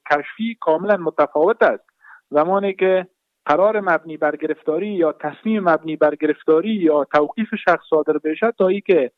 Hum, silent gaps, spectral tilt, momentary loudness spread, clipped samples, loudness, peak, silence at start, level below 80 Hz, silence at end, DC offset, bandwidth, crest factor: none; none; -8 dB/octave; 6 LU; under 0.1%; -19 LUFS; -4 dBFS; 0.05 s; -66 dBFS; 0.1 s; under 0.1%; 6.4 kHz; 14 dB